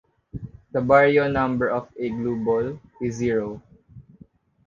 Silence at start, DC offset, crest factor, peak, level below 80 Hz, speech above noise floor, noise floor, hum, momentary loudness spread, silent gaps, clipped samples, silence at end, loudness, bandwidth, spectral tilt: 0.35 s; under 0.1%; 20 dB; -2 dBFS; -50 dBFS; 31 dB; -53 dBFS; none; 22 LU; none; under 0.1%; 0.65 s; -22 LUFS; 7.4 kHz; -7 dB/octave